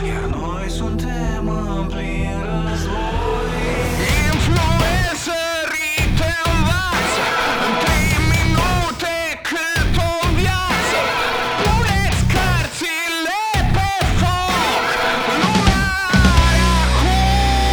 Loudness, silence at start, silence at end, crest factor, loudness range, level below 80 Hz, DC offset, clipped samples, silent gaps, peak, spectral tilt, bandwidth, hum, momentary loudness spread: -18 LUFS; 0 s; 0 s; 16 dB; 5 LU; -22 dBFS; under 0.1%; under 0.1%; none; -2 dBFS; -4.5 dB/octave; over 20 kHz; none; 7 LU